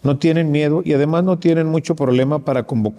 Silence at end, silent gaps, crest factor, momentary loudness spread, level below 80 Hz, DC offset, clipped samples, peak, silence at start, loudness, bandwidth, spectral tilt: 0.05 s; none; 12 dB; 3 LU; -56 dBFS; under 0.1%; under 0.1%; -4 dBFS; 0.05 s; -17 LUFS; 10.5 kHz; -8 dB/octave